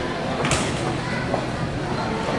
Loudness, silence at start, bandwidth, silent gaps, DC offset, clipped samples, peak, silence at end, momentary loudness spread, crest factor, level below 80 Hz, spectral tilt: -24 LUFS; 0 s; 11.5 kHz; none; under 0.1%; under 0.1%; -6 dBFS; 0 s; 4 LU; 20 dB; -40 dBFS; -4.5 dB/octave